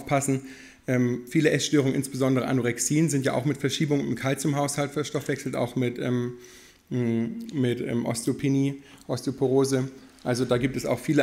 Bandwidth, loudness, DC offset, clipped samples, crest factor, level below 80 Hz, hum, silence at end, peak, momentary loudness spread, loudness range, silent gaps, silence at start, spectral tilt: 16 kHz; -26 LUFS; under 0.1%; under 0.1%; 18 dB; -58 dBFS; none; 0 s; -8 dBFS; 8 LU; 4 LU; none; 0 s; -5.5 dB/octave